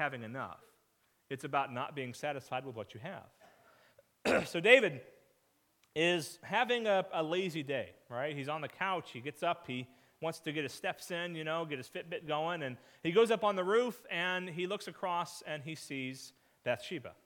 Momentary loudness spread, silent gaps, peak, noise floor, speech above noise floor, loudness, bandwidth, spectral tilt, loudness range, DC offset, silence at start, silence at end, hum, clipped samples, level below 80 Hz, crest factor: 14 LU; none; -8 dBFS; -75 dBFS; 40 dB; -35 LUFS; 18 kHz; -4.5 dB/octave; 8 LU; under 0.1%; 0 s; 0.15 s; none; under 0.1%; -78 dBFS; 28 dB